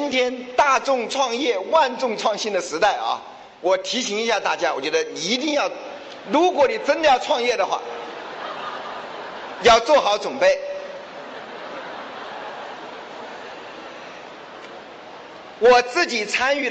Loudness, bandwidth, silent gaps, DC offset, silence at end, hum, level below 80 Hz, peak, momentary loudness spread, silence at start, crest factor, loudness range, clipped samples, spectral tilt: -20 LUFS; 8.6 kHz; none; under 0.1%; 0 s; none; -58 dBFS; -6 dBFS; 19 LU; 0 s; 16 dB; 14 LU; under 0.1%; -2 dB/octave